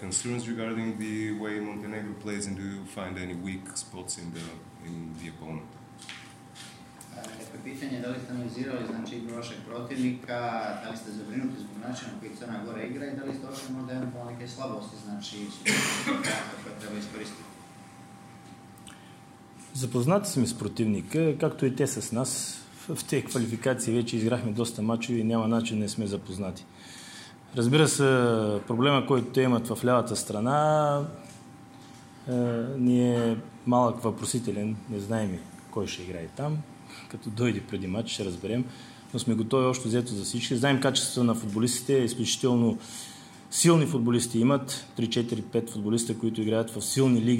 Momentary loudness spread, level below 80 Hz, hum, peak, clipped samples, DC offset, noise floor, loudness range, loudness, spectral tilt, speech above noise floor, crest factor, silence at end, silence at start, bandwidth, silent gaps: 19 LU; -68 dBFS; none; -8 dBFS; under 0.1%; under 0.1%; -50 dBFS; 12 LU; -28 LUFS; -5 dB/octave; 22 dB; 20 dB; 0 s; 0 s; 16.5 kHz; none